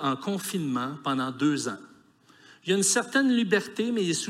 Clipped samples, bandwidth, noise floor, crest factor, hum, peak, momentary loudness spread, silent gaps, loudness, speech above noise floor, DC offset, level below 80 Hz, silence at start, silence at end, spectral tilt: under 0.1%; 16 kHz; -58 dBFS; 18 dB; none; -10 dBFS; 8 LU; none; -26 LUFS; 31 dB; under 0.1%; -80 dBFS; 0 s; 0 s; -3.5 dB/octave